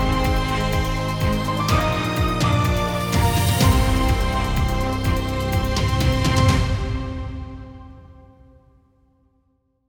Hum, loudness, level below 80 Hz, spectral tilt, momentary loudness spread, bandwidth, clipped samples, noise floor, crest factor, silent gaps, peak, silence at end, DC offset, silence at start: none; -21 LUFS; -26 dBFS; -5.5 dB/octave; 11 LU; over 20 kHz; under 0.1%; -66 dBFS; 14 dB; none; -6 dBFS; 1.7 s; under 0.1%; 0 s